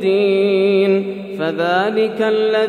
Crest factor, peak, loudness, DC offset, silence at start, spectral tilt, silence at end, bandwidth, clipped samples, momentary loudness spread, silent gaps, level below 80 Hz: 12 dB; -4 dBFS; -16 LUFS; under 0.1%; 0 s; -7 dB/octave; 0 s; 9.6 kHz; under 0.1%; 7 LU; none; -74 dBFS